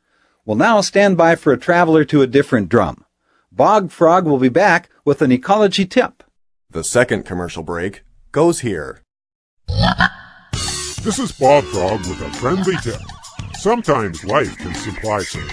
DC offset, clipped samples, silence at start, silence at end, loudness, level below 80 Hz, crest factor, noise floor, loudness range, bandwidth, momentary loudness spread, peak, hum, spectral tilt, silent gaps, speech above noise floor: under 0.1%; under 0.1%; 0.45 s; 0 s; -16 LUFS; -38 dBFS; 16 dB; -57 dBFS; 6 LU; 11 kHz; 13 LU; 0 dBFS; none; -5 dB/octave; 9.35-9.57 s; 42 dB